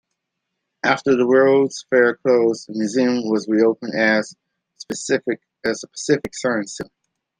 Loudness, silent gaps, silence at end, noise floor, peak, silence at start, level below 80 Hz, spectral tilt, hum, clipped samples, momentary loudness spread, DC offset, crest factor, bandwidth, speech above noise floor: -19 LUFS; none; 0.55 s; -78 dBFS; -2 dBFS; 0.85 s; -64 dBFS; -4.5 dB/octave; none; under 0.1%; 12 LU; under 0.1%; 18 dB; 10 kHz; 60 dB